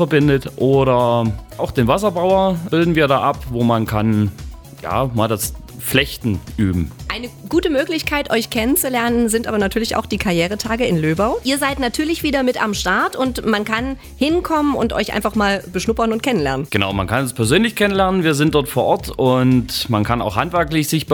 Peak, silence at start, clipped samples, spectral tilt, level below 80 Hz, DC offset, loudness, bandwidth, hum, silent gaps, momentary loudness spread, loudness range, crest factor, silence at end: 0 dBFS; 0 s; under 0.1%; -5 dB/octave; -36 dBFS; under 0.1%; -18 LUFS; over 20 kHz; none; none; 6 LU; 3 LU; 16 dB; 0 s